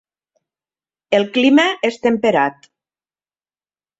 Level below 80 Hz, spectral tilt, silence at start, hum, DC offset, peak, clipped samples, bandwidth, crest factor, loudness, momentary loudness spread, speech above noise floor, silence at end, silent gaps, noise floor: -62 dBFS; -4.5 dB/octave; 1.1 s; none; under 0.1%; -2 dBFS; under 0.1%; 8 kHz; 18 dB; -16 LUFS; 6 LU; over 75 dB; 1.5 s; none; under -90 dBFS